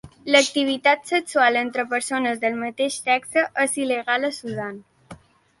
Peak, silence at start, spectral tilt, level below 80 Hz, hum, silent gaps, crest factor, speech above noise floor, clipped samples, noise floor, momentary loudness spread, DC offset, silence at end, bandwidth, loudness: -2 dBFS; 0.05 s; -2.5 dB/octave; -64 dBFS; none; none; 20 dB; 24 dB; under 0.1%; -46 dBFS; 8 LU; under 0.1%; 0.45 s; 12 kHz; -21 LUFS